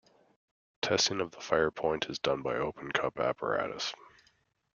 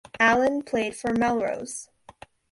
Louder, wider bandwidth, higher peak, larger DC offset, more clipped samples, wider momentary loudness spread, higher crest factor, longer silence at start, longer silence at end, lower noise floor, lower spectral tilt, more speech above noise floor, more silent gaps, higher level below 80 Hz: second, -32 LUFS vs -24 LUFS; second, 7.2 kHz vs 11.5 kHz; about the same, -10 dBFS vs -8 dBFS; neither; neither; second, 9 LU vs 14 LU; first, 24 dB vs 18 dB; first, 0.85 s vs 0.15 s; about the same, 0.7 s vs 0.7 s; first, -71 dBFS vs -50 dBFS; about the same, -3 dB/octave vs -4 dB/octave; first, 39 dB vs 26 dB; neither; second, -64 dBFS vs -56 dBFS